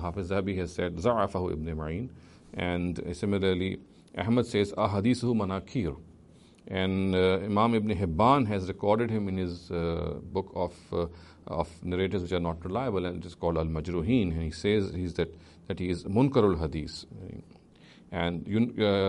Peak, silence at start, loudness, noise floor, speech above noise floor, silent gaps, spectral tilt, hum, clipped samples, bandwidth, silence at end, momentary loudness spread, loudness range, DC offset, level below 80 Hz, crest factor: -10 dBFS; 0 s; -29 LUFS; -55 dBFS; 27 dB; none; -7 dB/octave; none; under 0.1%; 11.5 kHz; 0 s; 11 LU; 5 LU; under 0.1%; -48 dBFS; 20 dB